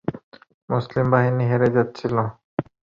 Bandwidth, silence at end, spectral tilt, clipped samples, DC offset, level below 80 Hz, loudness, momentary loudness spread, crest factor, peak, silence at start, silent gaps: 7 kHz; 0.35 s; -9.5 dB/octave; under 0.1%; under 0.1%; -54 dBFS; -22 LUFS; 12 LU; 18 dB; -4 dBFS; 0.1 s; 0.24-0.32 s, 0.54-0.68 s, 2.44-2.57 s